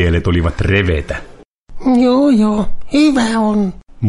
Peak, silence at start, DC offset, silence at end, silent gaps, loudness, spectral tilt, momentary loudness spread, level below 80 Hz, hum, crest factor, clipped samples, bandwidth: 0 dBFS; 0 s; under 0.1%; 0 s; 1.45-1.67 s; -14 LUFS; -7 dB/octave; 10 LU; -28 dBFS; none; 12 dB; under 0.1%; 11.5 kHz